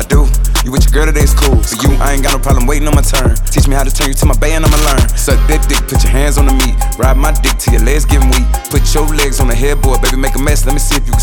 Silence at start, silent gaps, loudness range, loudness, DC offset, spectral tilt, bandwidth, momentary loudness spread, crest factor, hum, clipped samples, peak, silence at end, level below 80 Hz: 0 s; none; 1 LU; -12 LUFS; under 0.1%; -4.5 dB/octave; 19 kHz; 3 LU; 8 dB; none; under 0.1%; 0 dBFS; 0 s; -10 dBFS